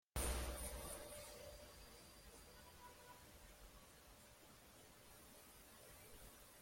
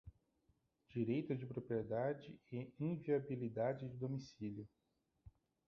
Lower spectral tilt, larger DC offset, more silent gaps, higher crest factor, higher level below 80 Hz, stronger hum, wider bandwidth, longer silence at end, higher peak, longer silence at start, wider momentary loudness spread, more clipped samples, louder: second, -3 dB/octave vs -8 dB/octave; neither; neither; first, 24 dB vs 18 dB; first, -58 dBFS vs -74 dBFS; neither; first, 16.5 kHz vs 6.8 kHz; second, 0 s vs 0.4 s; second, -32 dBFS vs -26 dBFS; about the same, 0.15 s vs 0.05 s; first, 16 LU vs 10 LU; neither; second, -55 LUFS vs -43 LUFS